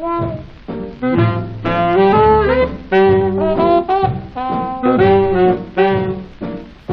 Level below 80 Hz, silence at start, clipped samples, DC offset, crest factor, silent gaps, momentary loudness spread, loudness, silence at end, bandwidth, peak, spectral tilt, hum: -34 dBFS; 0 s; under 0.1%; under 0.1%; 12 dB; none; 16 LU; -14 LUFS; 0 s; 5.4 kHz; -2 dBFS; -9.5 dB/octave; none